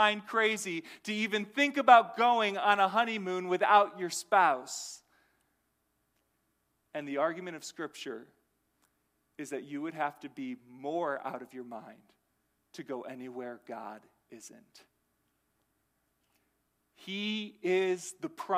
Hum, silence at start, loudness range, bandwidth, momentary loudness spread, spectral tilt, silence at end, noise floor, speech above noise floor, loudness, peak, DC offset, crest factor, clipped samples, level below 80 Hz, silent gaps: none; 0 s; 19 LU; 15.5 kHz; 20 LU; -3 dB/octave; 0 s; -78 dBFS; 47 dB; -30 LUFS; -6 dBFS; under 0.1%; 26 dB; under 0.1%; -86 dBFS; none